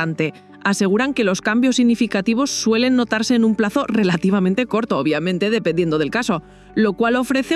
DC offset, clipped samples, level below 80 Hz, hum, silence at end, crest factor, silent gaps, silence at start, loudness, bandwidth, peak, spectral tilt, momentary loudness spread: under 0.1%; under 0.1%; -52 dBFS; none; 0 s; 14 dB; none; 0 s; -18 LUFS; 13.5 kHz; -4 dBFS; -5 dB/octave; 5 LU